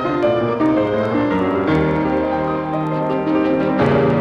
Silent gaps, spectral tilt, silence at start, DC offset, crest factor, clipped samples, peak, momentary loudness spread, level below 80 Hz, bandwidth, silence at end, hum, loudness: none; -8.5 dB/octave; 0 s; under 0.1%; 14 dB; under 0.1%; -4 dBFS; 4 LU; -42 dBFS; 7 kHz; 0 s; none; -18 LUFS